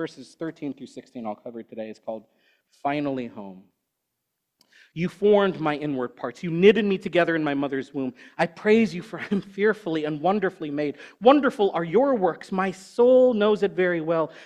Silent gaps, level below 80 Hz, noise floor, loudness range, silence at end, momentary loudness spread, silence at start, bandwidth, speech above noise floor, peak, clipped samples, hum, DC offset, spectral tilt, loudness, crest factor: none; -66 dBFS; -80 dBFS; 12 LU; 0 s; 18 LU; 0 s; 10.5 kHz; 57 dB; -2 dBFS; under 0.1%; none; under 0.1%; -7 dB/octave; -23 LUFS; 22 dB